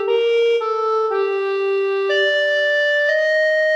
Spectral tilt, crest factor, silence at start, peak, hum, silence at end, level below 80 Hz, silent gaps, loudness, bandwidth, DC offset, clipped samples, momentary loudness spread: -0.5 dB/octave; 10 dB; 0 s; -8 dBFS; none; 0 s; -86 dBFS; none; -17 LUFS; 8.6 kHz; under 0.1%; under 0.1%; 4 LU